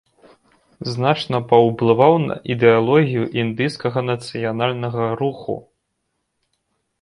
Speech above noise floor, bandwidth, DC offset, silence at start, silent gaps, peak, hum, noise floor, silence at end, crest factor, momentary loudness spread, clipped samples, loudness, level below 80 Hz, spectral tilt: 56 dB; 11 kHz; under 0.1%; 0.8 s; none; 0 dBFS; none; -73 dBFS; 1.4 s; 20 dB; 10 LU; under 0.1%; -18 LUFS; -58 dBFS; -7.5 dB/octave